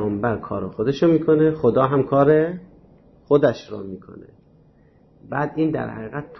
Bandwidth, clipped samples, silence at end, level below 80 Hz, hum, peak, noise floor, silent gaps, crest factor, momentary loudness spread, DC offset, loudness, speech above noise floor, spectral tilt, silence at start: 6.2 kHz; under 0.1%; 0.05 s; -52 dBFS; none; -4 dBFS; -54 dBFS; none; 16 dB; 16 LU; under 0.1%; -20 LUFS; 34 dB; -9 dB/octave; 0 s